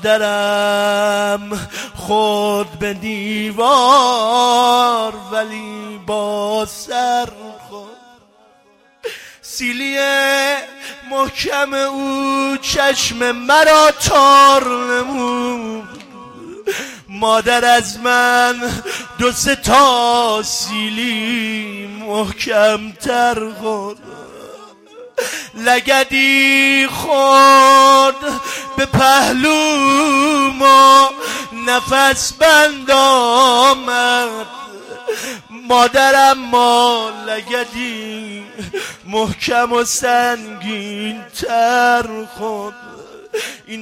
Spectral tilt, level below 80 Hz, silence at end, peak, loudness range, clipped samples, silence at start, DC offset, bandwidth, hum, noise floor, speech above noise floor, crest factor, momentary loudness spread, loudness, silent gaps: -2.5 dB/octave; -46 dBFS; 0 s; 0 dBFS; 9 LU; under 0.1%; 0 s; under 0.1%; 16.5 kHz; none; -52 dBFS; 38 dB; 14 dB; 17 LU; -13 LUFS; none